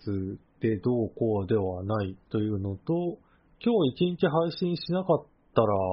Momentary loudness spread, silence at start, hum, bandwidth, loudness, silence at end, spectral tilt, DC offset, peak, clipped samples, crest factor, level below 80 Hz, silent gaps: 7 LU; 0.05 s; none; 5.6 kHz; -28 LUFS; 0 s; -7 dB/octave; under 0.1%; -8 dBFS; under 0.1%; 20 dB; -60 dBFS; none